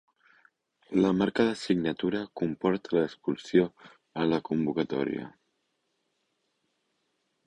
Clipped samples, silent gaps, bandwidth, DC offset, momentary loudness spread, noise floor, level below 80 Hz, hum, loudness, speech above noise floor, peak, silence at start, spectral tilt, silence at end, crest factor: under 0.1%; none; 10.5 kHz; under 0.1%; 8 LU; -77 dBFS; -64 dBFS; none; -29 LUFS; 50 dB; -10 dBFS; 0.9 s; -7 dB/octave; 2.15 s; 20 dB